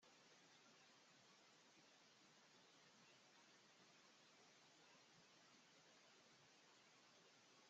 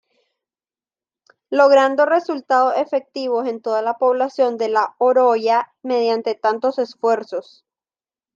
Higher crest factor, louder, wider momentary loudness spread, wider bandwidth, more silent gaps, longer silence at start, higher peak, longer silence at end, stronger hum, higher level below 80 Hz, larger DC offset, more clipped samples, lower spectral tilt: about the same, 14 dB vs 16 dB; second, -70 LUFS vs -18 LUFS; second, 0 LU vs 9 LU; about the same, 8 kHz vs 7.4 kHz; neither; second, 0 s vs 1.5 s; second, -60 dBFS vs -2 dBFS; second, 0 s vs 0.95 s; neither; second, under -90 dBFS vs -80 dBFS; neither; neither; second, -1 dB/octave vs -4 dB/octave